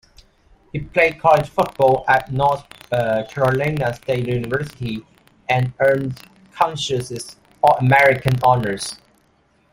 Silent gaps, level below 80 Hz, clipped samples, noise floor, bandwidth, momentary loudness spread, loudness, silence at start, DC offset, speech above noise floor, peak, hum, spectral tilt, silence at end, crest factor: none; -48 dBFS; under 0.1%; -59 dBFS; 16 kHz; 15 LU; -18 LUFS; 0.75 s; under 0.1%; 41 dB; -2 dBFS; none; -5.5 dB/octave; 0.75 s; 18 dB